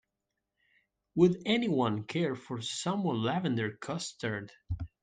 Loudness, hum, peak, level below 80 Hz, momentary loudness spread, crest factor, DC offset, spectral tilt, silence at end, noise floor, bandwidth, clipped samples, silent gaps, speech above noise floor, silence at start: -32 LUFS; none; -12 dBFS; -58 dBFS; 12 LU; 20 dB; under 0.1%; -5.5 dB/octave; 0.15 s; -86 dBFS; 9.8 kHz; under 0.1%; none; 55 dB; 1.15 s